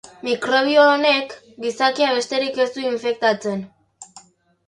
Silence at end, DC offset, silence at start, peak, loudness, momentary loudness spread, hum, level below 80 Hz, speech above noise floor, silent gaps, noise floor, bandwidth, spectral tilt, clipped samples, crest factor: 0.5 s; under 0.1%; 0.25 s; -2 dBFS; -19 LUFS; 14 LU; none; -70 dBFS; 30 dB; none; -49 dBFS; 11.5 kHz; -3.5 dB/octave; under 0.1%; 18 dB